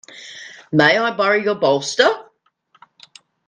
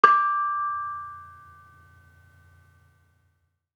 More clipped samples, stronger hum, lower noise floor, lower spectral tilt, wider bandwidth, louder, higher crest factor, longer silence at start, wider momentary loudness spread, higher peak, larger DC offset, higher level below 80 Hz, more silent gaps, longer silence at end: neither; neither; second, -60 dBFS vs -71 dBFS; about the same, -4 dB/octave vs -4 dB/octave; first, 10 kHz vs 7 kHz; first, -16 LUFS vs -24 LUFS; second, 20 dB vs 26 dB; about the same, 0.15 s vs 0.05 s; second, 20 LU vs 26 LU; about the same, 0 dBFS vs -2 dBFS; neither; first, -64 dBFS vs -74 dBFS; neither; second, 1.25 s vs 2.45 s